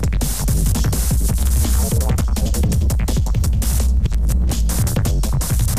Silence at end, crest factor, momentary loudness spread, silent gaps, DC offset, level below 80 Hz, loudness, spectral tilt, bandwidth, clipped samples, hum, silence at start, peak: 0 s; 10 dB; 2 LU; none; 3%; -18 dBFS; -19 LUFS; -5 dB/octave; 15.5 kHz; under 0.1%; none; 0 s; -6 dBFS